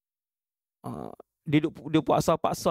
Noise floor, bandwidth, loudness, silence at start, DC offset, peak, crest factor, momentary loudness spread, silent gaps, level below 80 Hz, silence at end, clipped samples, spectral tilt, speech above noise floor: under -90 dBFS; 16 kHz; -26 LUFS; 0.85 s; under 0.1%; -8 dBFS; 20 dB; 19 LU; none; -56 dBFS; 0 s; under 0.1%; -6 dB/octave; over 63 dB